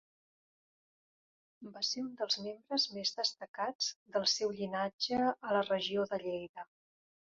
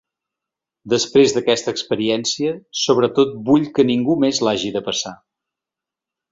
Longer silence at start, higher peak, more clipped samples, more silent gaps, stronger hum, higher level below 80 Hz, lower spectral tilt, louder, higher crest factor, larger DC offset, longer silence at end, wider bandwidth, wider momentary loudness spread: first, 1.6 s vs 0.85 s; second, -18 dBFS vs -2 dBFS; neither; first, 3.48-3.54 s, 3.75-3.79 s, 3.96-4.06 s, 4.93-4.99 s, 6.49-6.54 s vs none; neither; second, -78 dBFS vs -58 dBFS; second, -1.5 dB/octave vs -4 dB/octave; second, -35 LUFS vs -18 LUFS; about the same, 18 dB vs 18 dB; neither; second, 0.75 s vs 1.15 s; about the same, 7.4 kHz vs 7.8 kHz; about the same, 10 LU vs 8 LU